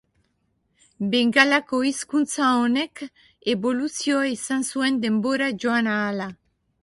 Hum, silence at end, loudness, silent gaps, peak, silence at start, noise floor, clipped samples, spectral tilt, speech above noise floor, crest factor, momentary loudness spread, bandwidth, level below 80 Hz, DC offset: none; 0.5 s; -22 LUFS; none; 0 dBFS; 1 s; -70 dBFS; under 0.1%; -3.5 dB/octave; 48 dB; 22 dB; 12 LU; 11.5 kHz; -66 dBFS; under 0.1%